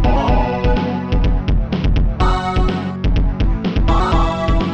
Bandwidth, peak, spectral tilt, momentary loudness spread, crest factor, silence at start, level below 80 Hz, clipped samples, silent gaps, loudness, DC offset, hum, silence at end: 7.6 kHz; -2 dBFS; -7.5 dB/octave; 4 LU; 12 dB; 0 s; -18 dBFS; under 0.1%; none; -18 LUFS; 2%; none; 0 s